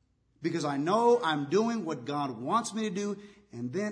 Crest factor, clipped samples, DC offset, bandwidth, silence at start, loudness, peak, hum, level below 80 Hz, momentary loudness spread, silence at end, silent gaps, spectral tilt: 16 dB; under 0.1%; under 0.1%; 10.5 kHz; 0.4 s; -30 LUFS; -14 dBFS; none; -76 dBFS; 12 LU; 0 s; none; -5.5 dB/octave